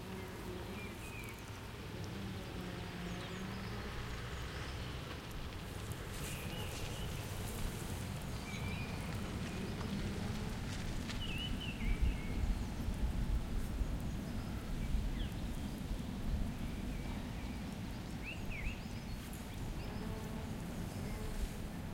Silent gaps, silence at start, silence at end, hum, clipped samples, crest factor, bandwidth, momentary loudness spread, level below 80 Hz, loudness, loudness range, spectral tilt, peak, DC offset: none; 0 s; 0 s; none; under 0.1%; 18 dB; 17 kHz; 5 LU; -44 dBFS; -43 LUFS; 4 LU; -5.5 dB/octave; -22 dBFS; under 0.1%